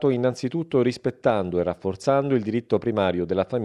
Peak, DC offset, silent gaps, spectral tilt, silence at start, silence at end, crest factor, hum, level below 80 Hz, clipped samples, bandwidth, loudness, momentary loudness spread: -6 dBFS; under 0.1%; none; -7 dB/octave; 0 s; 0 s; 16 dB; none; -56 dBFS; under 0.1%; 11 kHz; -24 LUFS; 4 LU